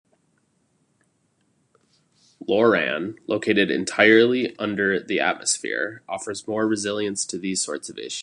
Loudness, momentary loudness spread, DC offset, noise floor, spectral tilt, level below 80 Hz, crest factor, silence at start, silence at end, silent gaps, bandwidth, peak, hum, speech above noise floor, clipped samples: -22 LUFS; 13 LU; under 0.1%; -68 dBFS; -3 dB/octave; -66 dBFS; 22 dB; 2.4 s; 0 s; none; 11.5 kHz; -2 dBFS; none; 45 dB; under 0.1%